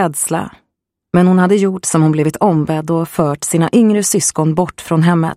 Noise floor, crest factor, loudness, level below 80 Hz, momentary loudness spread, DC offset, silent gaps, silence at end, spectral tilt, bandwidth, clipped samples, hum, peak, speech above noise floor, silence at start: -73 dBFS; 12 dB; -14 LUFS; -50 dBFS; 6 LU; under 0.1%; none; 0 s; -5.5 dB/octave; 15.5 kHz; under 0.1%; none; 0 dBFS; 60 dB; 0 s